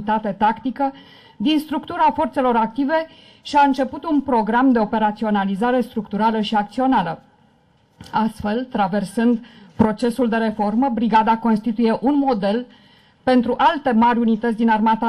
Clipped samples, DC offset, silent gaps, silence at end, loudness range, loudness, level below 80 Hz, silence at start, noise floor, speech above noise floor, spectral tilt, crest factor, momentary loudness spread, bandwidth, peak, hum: under 0.1%; under 0.1%; none; 0 s; 3 LU; -19 LUFS; -50 dBFS; 0 s; -57 dBFS; 39 dB; -6.5 dB/octave; 14 dB; 8 LU; 12.5 kHz; -6 dBFS; none